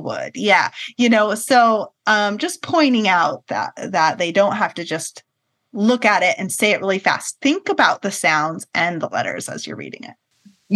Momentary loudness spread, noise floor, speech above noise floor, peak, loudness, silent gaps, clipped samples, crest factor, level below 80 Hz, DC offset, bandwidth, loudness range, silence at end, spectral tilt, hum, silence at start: 12 LU; -51 dBFS; 33 dB; 0 dBFS; -18 LUFS; none; under 0.1%; 18 dB; -72 dBFS; under 0.1%; 12.5 kHz; 3 LU; 0 s; -3.5 dB/octave; none; 0 s